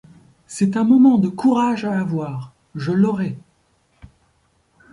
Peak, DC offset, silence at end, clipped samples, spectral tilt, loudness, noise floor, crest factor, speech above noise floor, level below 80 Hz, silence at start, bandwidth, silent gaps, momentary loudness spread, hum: -4 dBFS; under 0.1%; 1.55 s; under 0.1%; -7.5 dB/octave; -18 LUFS; -62 dBFS; 16 dB; 45 dB; -58 dBFS; 0.5 s; 11.5 kHz; none; 19 LU; none